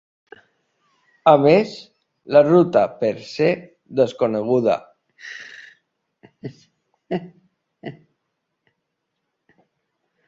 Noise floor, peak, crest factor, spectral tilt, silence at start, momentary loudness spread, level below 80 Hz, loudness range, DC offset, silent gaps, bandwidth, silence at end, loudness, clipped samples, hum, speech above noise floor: -77 dBFS; -2 dBFS; 20 dB; -7.5 dB/octave; 1.25 s; 24 LU; -64 dBFS; 19 LU; under 0.1%; none; 7.6 kHz; 2.35 s; -18 LUFS; under 0.1%; none; 59 dB